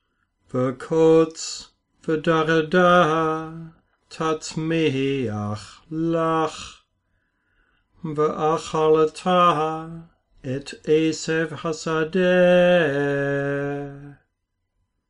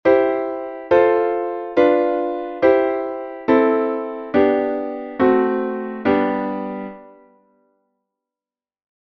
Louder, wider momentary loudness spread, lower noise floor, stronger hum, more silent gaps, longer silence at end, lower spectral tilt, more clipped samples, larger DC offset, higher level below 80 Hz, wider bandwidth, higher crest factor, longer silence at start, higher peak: about the same, -21 LUFS vs -19 LUFS; first, 17 LU vs 11 LU; second, -76 dBFS vs under -90 dBFS; neither; neither; second, 0.95 s vs 1.9 s; second, -5.5 dB/octave vs -8 dB/octave; neither; neither; about the same, -56 dBFS vs -56 dBFS; first, 10.5 kHz vs 6 kHz; about the same, 16 dB vs 18 dB; first, 0.55 s vs 0.05 s; second, -6 dBFS vs -2 dBFS